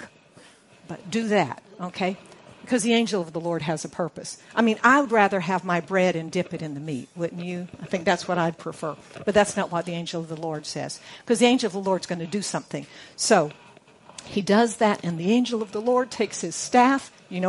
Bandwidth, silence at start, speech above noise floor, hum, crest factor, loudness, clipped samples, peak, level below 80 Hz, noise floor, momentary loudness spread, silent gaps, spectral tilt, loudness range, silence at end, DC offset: 11.5 kHz; 0 s; 28 dB; none; 22 dB; -24 LUFS; under 0.1%; -2 dBFS; -64 dBFS; -52 dBFS; 14 LU; none; -4.5 dB/octave; 4 LU; 0 s; under 0.1%